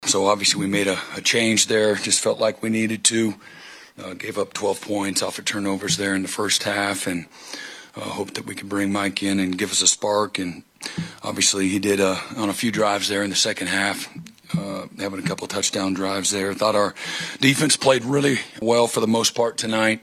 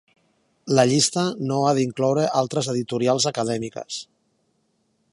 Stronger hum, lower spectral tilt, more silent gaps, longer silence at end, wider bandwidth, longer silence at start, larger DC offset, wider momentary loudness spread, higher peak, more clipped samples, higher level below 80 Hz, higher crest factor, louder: neither; second, -3 dB/octave vs -4.5 dB/octave; neither; second, 0.05 s vs 1.1 s; first, 14.5 kHz vs 11.5 kHz; second, 0 s vs 0.65 s; neither; about the same, 14 LU vs 13 LU; first, 0 dBFS vs -4 dBFS; neither; about the same, -64 dBFS vs -66 dBFS; about the same, 22 dB vs 20 dB; about the same, -21 LUFS vs -22 LUFS